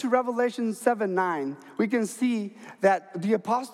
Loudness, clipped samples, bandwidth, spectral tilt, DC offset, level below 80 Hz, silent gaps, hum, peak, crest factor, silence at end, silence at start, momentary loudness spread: -27 LUFS; under 0.1%; 15 kHz; -5.5 dB/octave; under 0.1%; -86 dBFS; none; none; -8 dBFS; 18 dB; 0 s; 0 s; 7 LU